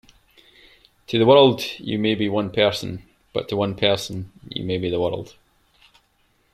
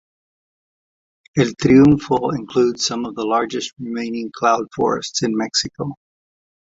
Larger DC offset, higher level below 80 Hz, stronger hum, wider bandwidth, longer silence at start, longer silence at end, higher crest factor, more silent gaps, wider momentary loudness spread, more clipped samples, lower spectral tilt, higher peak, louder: neither; second, -56 dBFS vs -50 dBFS; neither; first, 15 kHz vs 7.8 kHz; second, 1.1 s vs 1.35 s; first, 1.25 s vs 0.8 s; about the same, 22 dB vs 18 dB; neither; first, 18 LU vs 14 LU; neither; about the same, -5.5 dB/octave vs -5 dB/octave; about the same, -2 dBFS vs -2 dBFS; second, -21 LUFS vs -18 LUFS